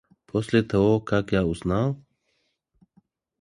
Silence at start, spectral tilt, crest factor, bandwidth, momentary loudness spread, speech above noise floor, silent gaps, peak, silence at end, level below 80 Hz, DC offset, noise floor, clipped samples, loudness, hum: 0.35 s; -7.5 dB/octave; 18 dB; 11.5 kHz; 8 LU; 50 dB; none; -6 dBFS; 1.45 s; -46 dBFS; under 0.1%; -73 dBFS; under 0.1%; -24 LUFS; none